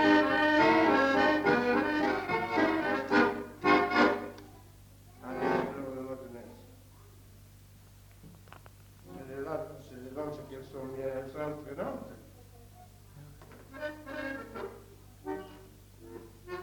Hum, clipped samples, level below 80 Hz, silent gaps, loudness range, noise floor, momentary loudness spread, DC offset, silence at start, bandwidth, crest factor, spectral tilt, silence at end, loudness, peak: none; under 0.1%; -60 dBFS; none; 18 LU; -55 dBFS; 24 LU; under 0.1%; 0 s; 19 kHz; 20 dB; -5.5 dB/octave; 0 s; -30 LUFS; -12 dBFS